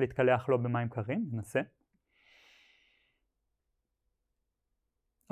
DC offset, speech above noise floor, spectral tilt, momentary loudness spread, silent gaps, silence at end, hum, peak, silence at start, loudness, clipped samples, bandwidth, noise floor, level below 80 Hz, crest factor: under 0.1%; 52 dB; -7.5 dB/octave; 8 LU; none; 3.65 s; none; -14 dBFS; 0 s; -32 LUFS; under 0.1%; 13 kHz; -83 dBFS; -66 dBFS; 22 dB